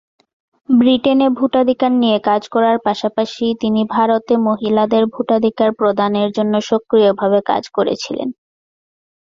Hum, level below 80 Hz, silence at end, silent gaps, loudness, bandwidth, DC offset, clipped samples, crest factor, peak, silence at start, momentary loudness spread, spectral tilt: none; -58 dBFS; 1.05 s; none; -15 LUFS; 7.4 kHz; under 0.1%; under 0.1%; 14 dB; 0 dBFS; 0.7 s; 6 LU; -6 dB/octave